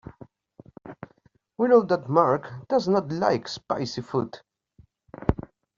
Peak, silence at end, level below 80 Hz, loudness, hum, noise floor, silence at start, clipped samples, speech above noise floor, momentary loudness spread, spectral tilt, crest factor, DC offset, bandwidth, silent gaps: -4 dBFS; 0.35 s; -48 dBFS; -25 LUFS; none; -63 dBFS; 0.85 s; under 0.1%; 40 dB; 25 LU; -5.5 dB/octave; 22 dB; under 0.1%; 7.4 kHz; none